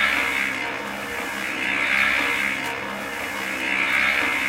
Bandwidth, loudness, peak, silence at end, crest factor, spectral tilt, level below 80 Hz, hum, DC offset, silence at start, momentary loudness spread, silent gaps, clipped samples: 16 kHz; -22 LUFS; -6 dBFS; 0 s; 16 dB; -2 dB/octave; -52 dBFS; none; under 0.1%; 0 s; 10 LU; none; under 0.1%